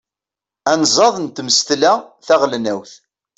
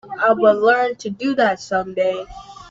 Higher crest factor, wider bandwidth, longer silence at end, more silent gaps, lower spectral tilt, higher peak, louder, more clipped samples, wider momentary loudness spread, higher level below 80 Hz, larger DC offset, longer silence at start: about the same, 16 dB vs 16 dB; about the same, 8.4 kHz vs 7.8 kHz; first, 0.45 s vs 0 s; neither; second, -2 dB/octave vs -5 dB/octave; about the same, 0 dBFS vs -2 dBFS; first, -15 LUFS vs -18 LUFS; neither; second, 11 LU vs 14 LU; second, -62 dBFS vs -52 dBFS; neither; first, 0.65 s vs 0.05 s